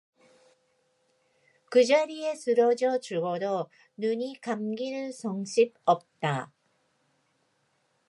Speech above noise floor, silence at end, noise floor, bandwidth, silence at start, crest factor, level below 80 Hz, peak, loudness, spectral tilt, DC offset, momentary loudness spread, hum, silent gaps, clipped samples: 45 dB; 1.65 s; -72 dBFS; 11.5 kHz; 1.7 s; 20 dB; -86 dBFS; -10 dBFS; -28 LUFS; -5 dB/octave; under 0.1%; 11 LU; none; none; under 0.1%